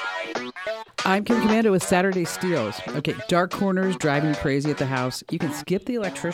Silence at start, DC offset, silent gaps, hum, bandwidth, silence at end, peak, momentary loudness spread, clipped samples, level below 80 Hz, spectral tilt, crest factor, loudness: 0 s; under 0.1%; none; none; 17 kHz; 0 s; -6 dBFS; 8 LU; under 0.1%; -54 dBFS; -5.5 dB/octave; 18 dB; -24 LUFS